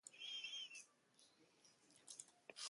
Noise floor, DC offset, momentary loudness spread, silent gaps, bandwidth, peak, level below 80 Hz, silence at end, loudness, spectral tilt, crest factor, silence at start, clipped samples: -75 dBFS; under 0.1%; 19 LU; none; 11.5 kHz; -36 dBFS; under -90 dBFS; 0 s; -52 LUFS; 2 dB/octave; 22 dB; 0.05 s; under 0.1%